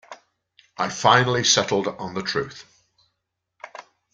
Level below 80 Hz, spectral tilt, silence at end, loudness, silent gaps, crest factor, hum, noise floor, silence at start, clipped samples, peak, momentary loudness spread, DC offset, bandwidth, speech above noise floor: -60 dBFS; -2.5 dB/octave; 0.3 s; -20 LUFS; none; 22 dB; none; -79 dBFS; 0.1 s; under 0.1%; -2 dBFS; 23 LU; under 0.1%; 10 kHz; 58 dB